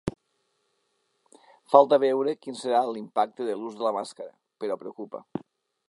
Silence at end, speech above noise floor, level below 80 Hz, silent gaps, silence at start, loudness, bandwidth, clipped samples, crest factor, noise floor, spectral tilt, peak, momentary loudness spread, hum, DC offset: 0.5 s; 49 dB; -62 dBFS; none; 0.05 s; -25 LUFS; 11 kHz; under 0.1%; 26 dB; -74 dBFS; -5.5 dB/octave; -2 dBFS; 20 LU; none; under 0.1%